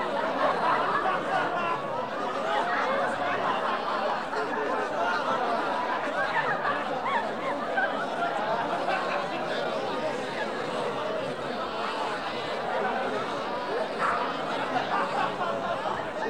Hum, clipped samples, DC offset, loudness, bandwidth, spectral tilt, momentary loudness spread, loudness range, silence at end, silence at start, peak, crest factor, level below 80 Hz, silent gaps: none; under 0.1%; 0.4%; -28 LUFS; 18 kHz; -4.5 dB/octave; 5 LU; 3 LU; 0 s; 0 s; -12 dBFS; 16 dB; -64 dBFS; none